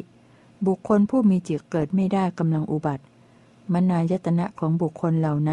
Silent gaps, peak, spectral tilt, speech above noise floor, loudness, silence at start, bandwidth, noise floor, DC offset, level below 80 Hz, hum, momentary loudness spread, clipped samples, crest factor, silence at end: none; -8 dBFS; -9 dB/octave; 32 dB; -23 LUFS; 0 s; 9.4 kHz; -53 dBFS; under 0.1%; -60 dBFS; none; 7 LU; under 0.1%; 14 dB; 0 s